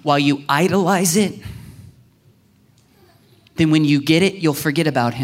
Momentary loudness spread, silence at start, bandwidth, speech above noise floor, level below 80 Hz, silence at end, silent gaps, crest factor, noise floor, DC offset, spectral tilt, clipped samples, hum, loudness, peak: 16 LU; 0.05 s; 16 kHz; 38 dB; -54 dBFS; 0 s; none; 16 dB; -55 dBFS; under 0.1%; -5 dB/octave; under 0.1%; none; -17 LUFS; -2 dBFS